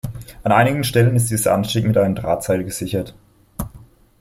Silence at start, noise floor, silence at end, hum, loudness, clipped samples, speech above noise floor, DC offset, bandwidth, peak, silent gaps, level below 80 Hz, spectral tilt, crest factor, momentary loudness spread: 0.05 s; -45 dBFS; 0.4 s; none; -18 LUFS; under 0.1%; 28 dB; under 0.1%; 16.5 kHz; -2 dBFS; none; -42 dBFS; -5.5 dB/octave; 18 dB; 16 LU